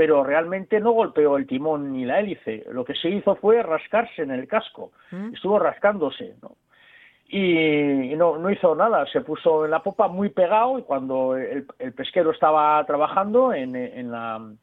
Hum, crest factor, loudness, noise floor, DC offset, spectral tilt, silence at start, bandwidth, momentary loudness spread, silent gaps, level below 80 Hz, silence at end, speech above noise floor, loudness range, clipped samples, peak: none; 16 dB; -22 LUFS; -53 dBFS; under 0.1%; -9 dB/octave; 0 s; 4.1 kHz; 12 LU; none; -66 dBFS; 0.05 s; 31 dB; 3 LU; under 0.1%; -4 dBFS